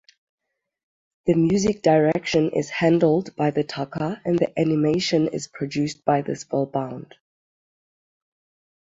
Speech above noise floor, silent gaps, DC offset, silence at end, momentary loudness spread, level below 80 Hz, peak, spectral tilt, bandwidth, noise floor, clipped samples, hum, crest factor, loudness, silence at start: over 69 dB; none; under 0.1%; 1.85 s; 10 LU; -58 dBFS; -4 dBFS; -6 dB/octave; 7.8 kHz; under -90 dBFS; under 0.1%; none; 18 dB; -22 LUFS; 1.25 s